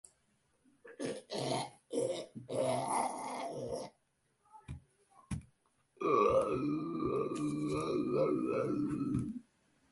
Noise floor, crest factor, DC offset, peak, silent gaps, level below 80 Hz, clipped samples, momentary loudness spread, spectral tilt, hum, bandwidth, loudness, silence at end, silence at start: -77 dBFS; 20 dB; under 0.1%; -18 dBFS; none; -62 dBFS; under 0.1%; 14 LU; -6 dB/octave; none; 11.5 kHz; -36 LUFS; 0.5 s; 0.85 s